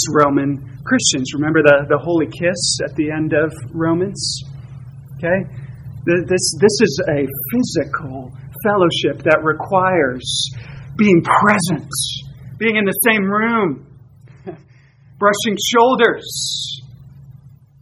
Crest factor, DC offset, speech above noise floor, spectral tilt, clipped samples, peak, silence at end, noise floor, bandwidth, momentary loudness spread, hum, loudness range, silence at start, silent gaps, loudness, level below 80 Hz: 18 dB; under 0.1%; 31 dB; -4 dB/octave; under 0.1%; 0 dBFS; 0.3 s; -47 dBFS; 16 kHz; 18 LU; none; 4 LU; 0 s; none; -16 LUFS; -48 dBFS